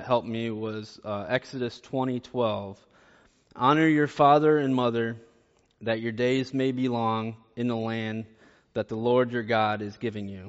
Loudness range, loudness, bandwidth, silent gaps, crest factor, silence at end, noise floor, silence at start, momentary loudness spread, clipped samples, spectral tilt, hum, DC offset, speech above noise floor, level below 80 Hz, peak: 6 LU; -27 LUFS; 8 kHz; none; 20 dB; 0 s; -64 dBFS; 0 s; 14 LU; under 0.1%; -5 dB/octave; none; under 0.1%; 38 dB; -66 dBFS; -6 dBFS